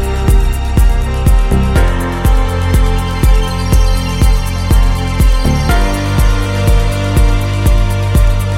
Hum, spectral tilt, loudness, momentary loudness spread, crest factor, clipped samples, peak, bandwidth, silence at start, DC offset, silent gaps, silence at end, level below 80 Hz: none; -6 dB/octave; -13 LUFS; 2 LU; 10 dB; under 0.1%; 0 dBFS; 16 kHz; 0 s; under 0.1%; none; 0 s; -12 dBFS